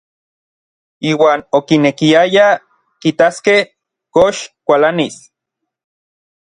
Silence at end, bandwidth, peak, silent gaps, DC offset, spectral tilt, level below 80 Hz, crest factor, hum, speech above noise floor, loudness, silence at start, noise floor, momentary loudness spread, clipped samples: 1.35 s; 10.5 kHz; 0 dBFS; none; under 0.1%; -5 dB/octave; -54 dBFS; 14 dB; none; 66 dB; -13 LUFS; 1 s; -78 dBFS; 9 LU; under 0.1%